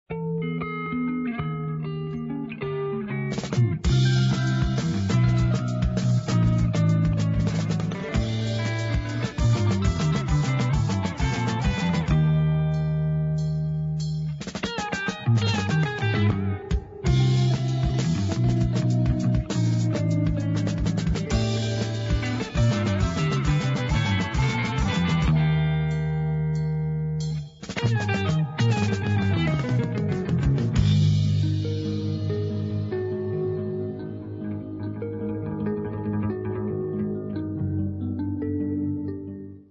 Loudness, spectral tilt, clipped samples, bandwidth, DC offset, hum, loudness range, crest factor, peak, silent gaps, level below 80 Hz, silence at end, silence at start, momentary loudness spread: -25 LUFS; -7 dB/octave; under 0.1%; 7.8 kHz; under 0.1%; none; 6 LU; 14 dB; -10 dBFS; none; -36 dBFS; 0.1 s; 0.1 s; 8 LU